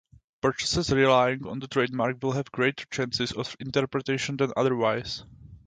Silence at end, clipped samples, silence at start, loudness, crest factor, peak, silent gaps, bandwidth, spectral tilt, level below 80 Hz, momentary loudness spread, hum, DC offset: 0.1 s; under 0.1%; 0.45 s; -26 LUFS; 20 dB; -8 dBFS; none; 9.4 kHz; -5 dB/octave; -52 dBFS; 10 LU; none; under 0.1%